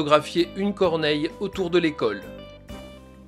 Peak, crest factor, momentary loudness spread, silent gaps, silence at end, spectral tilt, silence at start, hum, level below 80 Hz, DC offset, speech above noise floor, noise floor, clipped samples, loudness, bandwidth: -2 dBFS; 22 dB; 20 LU; none; 0 s; -5.5 dB/octave; 0 s; none; -50 dBFS; under 0.1%; 20 dB; -43 dBFS; under 0.1%; -24 LUFS; 13.5 kHz